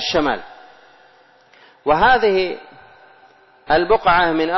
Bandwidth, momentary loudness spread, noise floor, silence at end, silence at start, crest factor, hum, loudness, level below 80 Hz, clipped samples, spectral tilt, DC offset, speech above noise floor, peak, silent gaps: 6.2 kHz; 13 LU; -51 dBFS; 0 s; 0 s; 14 dB; none; -17 LUFS; -44 dBFS; under 0.1%; -5 dB/octave; under 0.1%; 36 dB; -6 dBFS; none